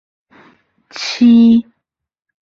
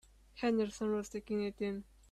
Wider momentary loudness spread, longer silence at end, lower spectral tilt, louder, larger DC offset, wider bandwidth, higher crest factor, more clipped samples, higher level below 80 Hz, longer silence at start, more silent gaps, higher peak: first, 17 LU vs 8 LU; first, 0.8 s vs 0.3 s; about the same, -5 dB/octave vs -5.5 dB/octave; first, -11 LUFS vs -37 LUFS; neither; second, 7 kHz vs 13 kHz; about the same, 12 dB vs 14 dB; neither; first, -56 dBFS vs -62 dBFS; first, 0.95 s vs 0.35 s; neither; first, -2 dBFS vs -24 dBFS